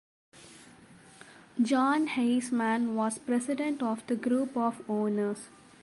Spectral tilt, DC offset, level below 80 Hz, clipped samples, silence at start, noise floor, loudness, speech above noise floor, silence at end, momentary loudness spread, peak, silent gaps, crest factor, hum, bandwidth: -5 dB/octave; under 0.1%; -76 dBFS; under 0.1%; 0.35 s; -55 dBFS; -29 LUFS; 26 dB; 0.35 s; 8 LU; -16 dBFS; none; 14 dB; none; 11.5 kHz